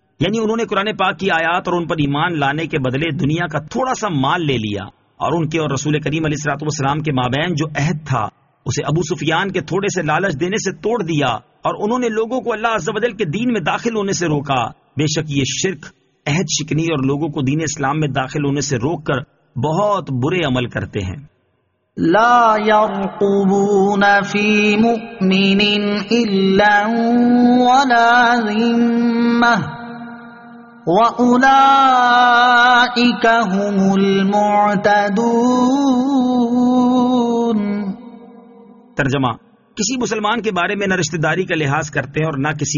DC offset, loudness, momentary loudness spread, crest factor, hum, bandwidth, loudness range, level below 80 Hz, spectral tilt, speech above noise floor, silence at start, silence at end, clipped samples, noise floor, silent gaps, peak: under 0.1%; -16 LUFS; 10 LU; 14 dB; none; 7.4 kHz; 7 LU; -48 dBFS; -4 dB/octave; 49 dB; 0.2 s; 0 s; under 0.1%; -64 dBFS; none; -2 dBFS